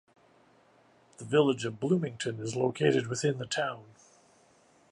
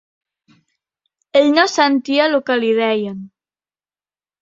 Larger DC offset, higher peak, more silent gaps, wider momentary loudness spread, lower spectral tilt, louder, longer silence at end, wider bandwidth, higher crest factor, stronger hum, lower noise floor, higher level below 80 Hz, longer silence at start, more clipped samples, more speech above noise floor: neither; second, -12 dBFS vs -2 dBFS; neither; about the same, 9 LU vs 8 LU; first, -5.5 dB/octave vs -3.5 dB/octave; second, -30 LUFS vs -15 LUFS; about the same, 1.1 s vs 1.15 s; first, 11 kHz vs 7.8 kHz; about the same, 20 dB vs 18 dB; neither; second, -63 dBFS vs under -90 dBFS; second, -72 dBFS vs -66 dBFS; second, 1.2 s vs 1.35 s; neither; second, 34 dB vs over 75 dB